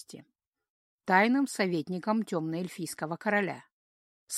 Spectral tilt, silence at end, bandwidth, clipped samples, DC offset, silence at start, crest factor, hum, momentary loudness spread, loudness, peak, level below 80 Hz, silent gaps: -5 dB/octave; 0 s; 15.5 kHz; under 0.1%; under 0.1%; 0.1 s; 24 dB; none; 13 LU; -29 LUFS; -8 dBFS; -80 dBFS; 0.47-0.51 s, 0.70-0.98 s, 3.72-4.27 s